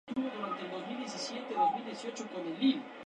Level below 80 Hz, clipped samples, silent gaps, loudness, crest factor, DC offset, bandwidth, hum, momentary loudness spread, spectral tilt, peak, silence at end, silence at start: -82 dBFS; under 0.1%; none; -35 LUFS; 18 dB; under 0.1%; 10 kHz; none; 9 LU; -4 dB/octave; -18 dBFS; 0 s; 0.05 s